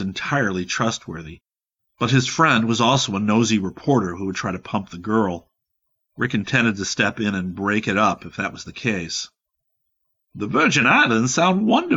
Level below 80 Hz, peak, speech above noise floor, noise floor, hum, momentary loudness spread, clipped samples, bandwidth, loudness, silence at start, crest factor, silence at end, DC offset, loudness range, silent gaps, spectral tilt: -56 dBFS; -4 dBFS; 59 dB; -79 dBFS; none; 11 LU; under 0.1%; 8 kHz; -20 LUFS; 0 s; 18 dB; 0 s; under 0.1%; 4 LU; none; -4.5 dB/octave